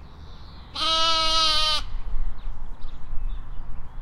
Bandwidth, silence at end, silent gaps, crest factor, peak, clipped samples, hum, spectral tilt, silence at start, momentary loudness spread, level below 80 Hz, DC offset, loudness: 11.5 kHz; 0 s; none; 16 dB; -8 dBFS; under 0.1%; none; -1.5 dB/octave; 0 s; 24 LU; -30 dBFS; under 0.1%; -20 LUFS